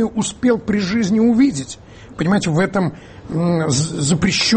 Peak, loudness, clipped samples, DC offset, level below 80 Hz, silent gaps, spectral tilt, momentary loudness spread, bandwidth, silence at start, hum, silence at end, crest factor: -4 dBFS; -17 LUFS; under 0.1%; under 0.1%; -44 dBFS; none; -5 dB/octave; 12 LU; 8.8 kHz; 0 s; none; 0 s; 12 dB